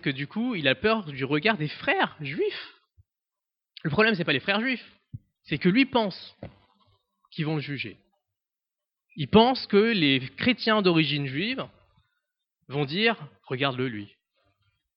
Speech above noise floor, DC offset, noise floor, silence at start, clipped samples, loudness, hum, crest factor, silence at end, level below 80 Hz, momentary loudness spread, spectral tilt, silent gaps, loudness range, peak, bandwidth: 64 dB; under 0.1%; -89 dBFS; 0.05 s; under 0.1%; -25 LUFS; none; 24 dB; 0.9 s; -60 dBFS; 15 LU; -9 dB/octave; none; 7 LU; -4 dBFS; 5.8 kHz